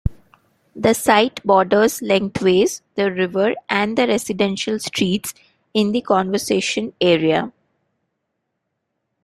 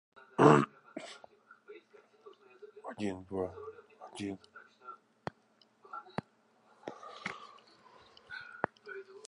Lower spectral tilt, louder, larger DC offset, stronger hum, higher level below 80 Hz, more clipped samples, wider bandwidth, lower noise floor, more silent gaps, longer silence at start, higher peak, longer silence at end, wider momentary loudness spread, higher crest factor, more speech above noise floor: second, -4.5 dB/octave vs -6.5 dB/octave; first, -18 LUFS vs -33 LUFS; neither; neither; first, -44 dBFS vs -70 dBFS; neither; first, 16 kHz vs 10.5 kHz; first, -75 dBFS vs -69 dBFS; neither; second, 0.05 s vs 0.4 s; first, -2 dBFS vs -8 dBFS; first, 1.75 s vs 0.1 s; second, 7 LU vs 28 LU; second, 18 dB vs 30 dB; first, 58 dB vs 39 dB